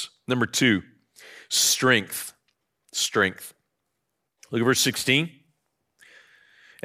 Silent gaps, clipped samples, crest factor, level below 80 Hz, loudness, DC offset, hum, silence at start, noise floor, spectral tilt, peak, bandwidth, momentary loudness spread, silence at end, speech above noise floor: none; under 0.1%; 22 dB; -70 dBFS; -23 LUFS; under 0.1%; none; 0 s; -79 dBFS; -2.5 dB/octave; -6 dBFS; 16 kHz; 14 LU; 1.55 s; 56 dB